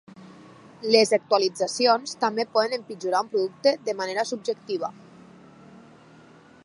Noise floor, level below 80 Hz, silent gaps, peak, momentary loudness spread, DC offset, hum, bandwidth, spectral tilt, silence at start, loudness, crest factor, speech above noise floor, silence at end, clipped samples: -51 dBFS; -76 dBFS; none; -2 dBFS; 10 LU; under 0.1%; none; 11.5 kHz; -3 dB/octave; 0.2 s; -24 LUFS; 24 dB; 27 dB; 1.75 s; under 0.1%